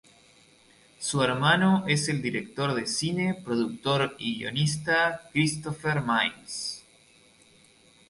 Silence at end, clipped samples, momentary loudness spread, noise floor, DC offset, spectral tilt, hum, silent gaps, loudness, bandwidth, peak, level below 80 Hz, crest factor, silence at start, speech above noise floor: 1.3 s; under 0.1%; 10 LU; -58 dBFS; under 0.1%; -4.5 dB/octave; none; none; -27 LUFS; 11.5 kHz; -8 dBFS; -62 dBFS; 20 dB; 1 s; 32 dB